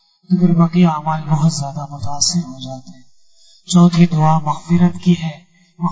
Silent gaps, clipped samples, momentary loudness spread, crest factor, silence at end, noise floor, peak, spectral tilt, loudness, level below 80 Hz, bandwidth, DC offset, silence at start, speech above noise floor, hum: none; under 0.1%; 15 LU; 14 dB; 0 s; -51 dBFS; -2 dBFS; -6 dB/octave; -15 LUFS; -48 dBFS; 8 kHz; under 0.1%; 0.3 s; 37 dB; none